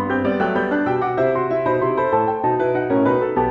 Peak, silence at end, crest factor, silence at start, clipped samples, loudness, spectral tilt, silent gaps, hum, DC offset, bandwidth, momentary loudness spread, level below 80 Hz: -6 dBFS; 0 s; 14 dB; 0 s; under 0.1%; -19 LUFS; -9 dB/octave; none; none; under 0.1%; 5.8 kHz; 2 LU; -50 dBFS